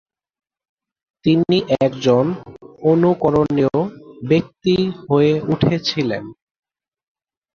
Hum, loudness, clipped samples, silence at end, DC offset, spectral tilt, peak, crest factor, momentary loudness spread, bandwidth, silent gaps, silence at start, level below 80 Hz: none; -18 LUFS; under 0.1%; 1.25 s; under 0.1%; -7.5 dB/octave; -2 dBFS; 16 dB; 8 LU; 7 kHz; none; 1.25 s; -50 dBFS